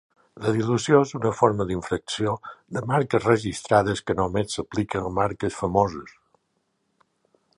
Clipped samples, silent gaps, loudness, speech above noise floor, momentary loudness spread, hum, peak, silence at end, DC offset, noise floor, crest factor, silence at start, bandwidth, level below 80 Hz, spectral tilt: under 0.1%; none; -24 LUFS; 50 dB; 8 LU; none; -2 dBFS; 1.45 s; under 0.1%; -73 dBFS; 22 dB; 0.35 s; 11.5 kHz; -50 dBFS; -6 dB/octave